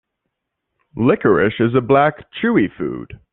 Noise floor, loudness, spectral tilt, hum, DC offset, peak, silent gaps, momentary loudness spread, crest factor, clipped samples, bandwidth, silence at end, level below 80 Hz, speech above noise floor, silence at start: -77 dBFS; -17 LUFS; -5.5 dB/octave; none; under 0.1%; 0 dBFS; none; 12 LU; 18 dB; under 0.1%; 4.1 kHz; 0.2 s; -50 dBFS; 60 dB; 0.95 s